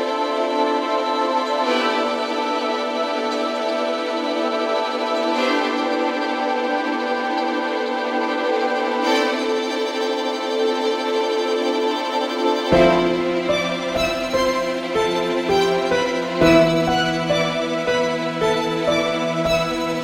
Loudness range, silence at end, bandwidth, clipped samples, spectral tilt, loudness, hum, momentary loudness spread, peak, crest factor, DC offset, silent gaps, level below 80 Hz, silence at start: 3 LU; 0 s; 16 kHz; under 0.1%; -4.5 dB/octave; -20 LUFS; none; 4 LU; -2 dBFS; 18 dB; under 0.1%; none; -48 dBFS; 0 s